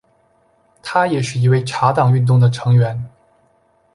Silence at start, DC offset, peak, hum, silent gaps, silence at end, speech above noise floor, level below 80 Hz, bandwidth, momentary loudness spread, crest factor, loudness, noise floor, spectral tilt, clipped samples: 0.85 s; under 0.1%; -2 dBFS; none; none; 0.85 s; 44 dB; -54 dBFS; 11 kHz; 12 LU; 16 dB; -16 LUFS; -58 dBFS; -7 dB/octave; under 0.1%